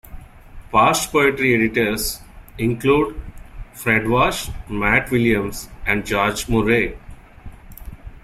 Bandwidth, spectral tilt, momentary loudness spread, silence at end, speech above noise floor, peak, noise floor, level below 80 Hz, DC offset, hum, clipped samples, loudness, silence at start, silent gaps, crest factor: 16 kHz; -4.5 dB/octave; 12 LU; 0.05 s; 21 dB; -2 dBFS; -39 dBFS; -36 dBFS; under 0.1%; none; under 0.1%; -19 LUFS; 0.1 s; none; 18 dB